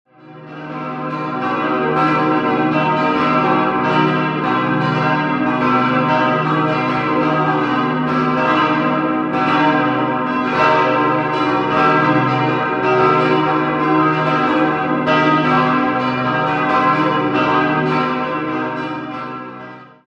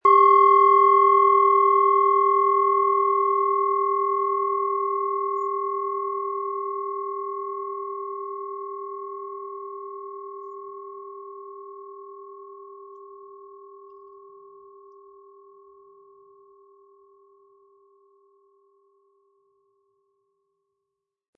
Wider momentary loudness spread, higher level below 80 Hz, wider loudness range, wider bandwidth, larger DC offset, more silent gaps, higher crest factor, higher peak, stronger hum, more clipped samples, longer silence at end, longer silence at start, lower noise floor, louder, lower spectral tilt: second, 8 LU vs 25 LU; first, -52 dBFS vs -84 dBFS; second, 2 LU vs 25 LU; first, 7.8 kHz vs 4.8 kHz; neither; neither; about the same, 16 dB vs 18 dB; first, -2 dBFS vs -6 dBFS; neither; neither; second, 0.2 s vs 7.5 s; first, 0.25 s vs 0.05 s; second, -37 dBFS vs -83 dBFS; first, -16 LUFS vs -21 LUFS; first, -7.5 dB/octave vs -5.5 dB/octave